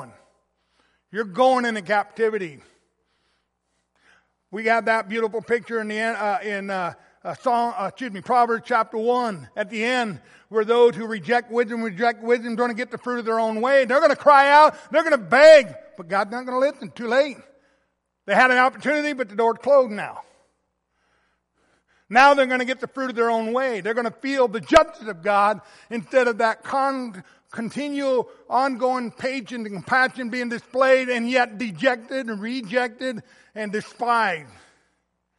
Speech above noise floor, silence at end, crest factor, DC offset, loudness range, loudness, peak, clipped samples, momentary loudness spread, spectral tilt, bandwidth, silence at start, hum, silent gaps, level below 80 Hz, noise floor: 53 dB; 0.95 s; 20 dB; under 0.1%; 9 LU; -21 LUFS; -2 dBFS; under 0.1%; 15 LU; -4.5 dB/octave; 11.5 kHz; 0 s; none; none; -60 dBFS; -73 dBFS